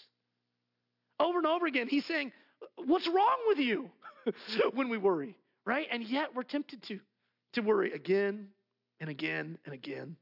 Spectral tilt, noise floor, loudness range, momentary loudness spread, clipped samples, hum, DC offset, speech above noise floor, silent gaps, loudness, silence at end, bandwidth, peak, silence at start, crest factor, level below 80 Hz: -6.5 dB/octave; -84 dBFS; 4 LU; 15 LU; under 0.1%; 60 Hz at -65 dBFS; under 0.1%; 52 dB; none; -32 LUFS; 0.05 s; 5.8 kHz; -16 dBFS; 1.2 s; 18 dB; -86 dBFS